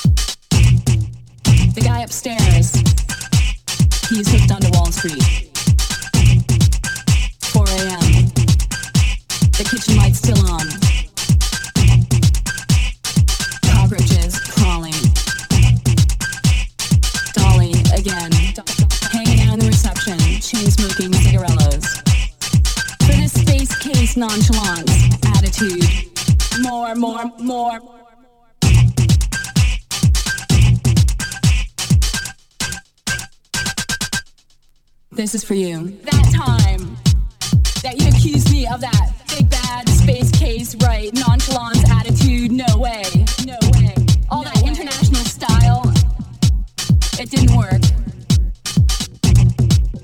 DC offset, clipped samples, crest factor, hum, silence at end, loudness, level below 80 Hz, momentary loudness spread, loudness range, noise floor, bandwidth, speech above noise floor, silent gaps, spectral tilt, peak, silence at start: under 0.1%; under 0.1%; 14 dB; none; 0.05 s; -16 LUFS; -20 dBFS; 7 LU; 3 LU; -52 dBFS; 17 kHz; 38 dB; none; -5 dB/octave; -2 dBFS; 0 s